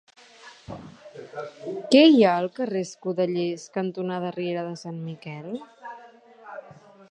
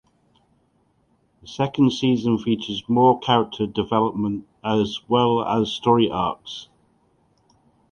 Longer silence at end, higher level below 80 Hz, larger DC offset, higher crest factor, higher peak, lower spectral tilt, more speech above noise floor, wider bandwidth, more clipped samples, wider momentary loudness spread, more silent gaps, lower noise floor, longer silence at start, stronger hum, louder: second, 0.5 s vs 1.25 s; second, -70 dBFS vs -54 dBFS; neither; about the same, 22 dB vs 20 dB; about the same, -4 dBFS vs -2 dBFS; about the same, -6 dB/octave vs -6.5 dB/octave; second, 26 dB vs 43 dB; first, 10 kHz vs 7.2 kHz; neither; first, 26 LU vs 9 LU; neither; second, -49 dBFS vs -64 dBFS; second, 0.45 s vs 1.45 s; neither; about the same, -23 LUFS vs -21 LUFS